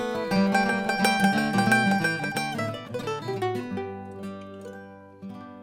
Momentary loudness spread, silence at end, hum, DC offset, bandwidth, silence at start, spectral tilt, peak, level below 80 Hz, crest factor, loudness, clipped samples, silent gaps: 20 LU; 0 s; none; under 0.1%; 17 kHz; 0 s; -5 dB/octave; -6 dBFS; -60 dBFS; 20 dB; -25 LUFS; under 0.1%; none